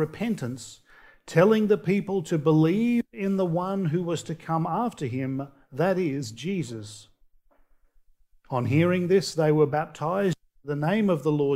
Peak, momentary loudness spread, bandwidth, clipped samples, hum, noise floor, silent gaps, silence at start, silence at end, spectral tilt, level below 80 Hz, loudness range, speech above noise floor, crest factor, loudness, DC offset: -6 dBFS; 12 LU; 15.5 kHz; under 0.1%; none; -60 dBFS; none; 0 s; 0 s; -7 dB/octave; -62 dBFS; 7 LU; 35 dB; 20 dB; -25 LUFS; under 0.1%